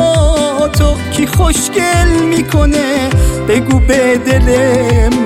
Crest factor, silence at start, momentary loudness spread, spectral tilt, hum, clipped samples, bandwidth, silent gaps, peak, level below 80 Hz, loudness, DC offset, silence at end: 10 dB; 0 s; 3 LU; -5.5 dB/octave; none; under 0.1%; 16 kHz; none; 0 dBFS; -16 dBFS; -11 LUFS; under 0.1%; 0 s